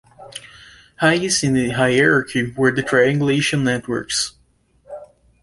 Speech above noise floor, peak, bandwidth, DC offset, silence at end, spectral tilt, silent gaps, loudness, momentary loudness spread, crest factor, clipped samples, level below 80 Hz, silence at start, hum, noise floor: 41 dB; -2 dBFS; 11.5 kHz; under 0.1%; 0.4 s; -4 dB/octave; none; -18 LUFS; 21 LU; 18 dB; under 0.1%; -52 dBFS; 0.2 s; none; -59 dBFS